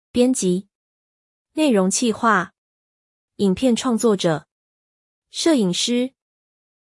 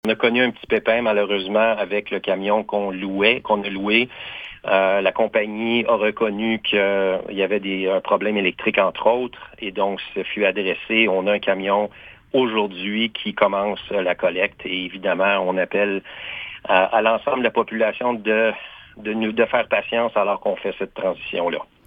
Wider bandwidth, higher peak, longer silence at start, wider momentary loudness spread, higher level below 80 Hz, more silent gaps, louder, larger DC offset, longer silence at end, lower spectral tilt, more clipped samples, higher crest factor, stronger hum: first, 12 kHz vs 5 kHz; second, -6 dBFS vs 0 dBFS; about the same, 0.15 s vs 0.05 s; about the same, 10 LU vs 8 LU; about the same, -60 dBFS vs -58 dBFS; first, 0.75-1.45 s, 2.58-3.28 s, 4.51-5.22 s vs none; about the same, -20 LUFS vs -20 LUFS; neither; first, 0.85 s vs 0.25 s; second, -4.5 dB/octave vs -7 dB/octave; neither; about the same, 16 dB vs 20 dB; neither